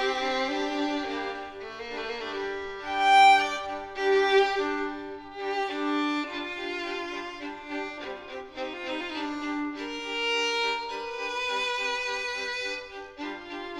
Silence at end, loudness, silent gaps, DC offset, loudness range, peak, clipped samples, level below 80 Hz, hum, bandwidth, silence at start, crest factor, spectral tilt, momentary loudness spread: 0 s; -28 LUFS; none; under 0.1%; 10 LU; -10 dBFS; under 0.1%; -60 dBFS; none; 12 kHz; 0 s; 18 dB; -2 dB/octave; 15 LU